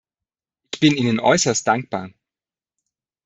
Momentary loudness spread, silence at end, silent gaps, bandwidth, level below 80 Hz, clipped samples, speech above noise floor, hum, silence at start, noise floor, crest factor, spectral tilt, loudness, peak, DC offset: 15 LU; 1.15 s; none; 8.4 kHz; -60 dBFS; under 0.1%; over 72 dB; none; 0.75 s; under -90 dBFS; 20 dB; -4 dB/octave; -18 LUFS; -2 dBFS; under 0.1%